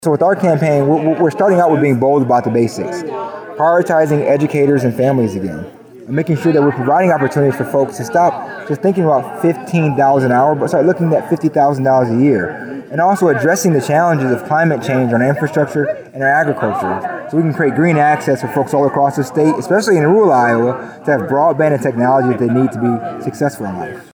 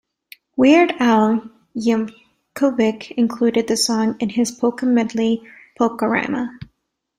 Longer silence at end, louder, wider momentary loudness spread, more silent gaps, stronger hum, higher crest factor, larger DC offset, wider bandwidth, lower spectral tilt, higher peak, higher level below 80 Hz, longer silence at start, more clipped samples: second, 0.1 s vs 0.55 s; first, -14 LUFS vs -18 LUFS; second, 8 LU vs 12 LU; neither; neither; second, 10 dB vs 16 dB; neither; first, over 20 kHz vs 15 kHz; first, -7 dB/octave vs -4.5 dB/octave; about the same, -2 dBFS vs -2 dBFS; about the same, -58 dBFS vs -60 dBFS; second, 0 s vs 0.55 s; neither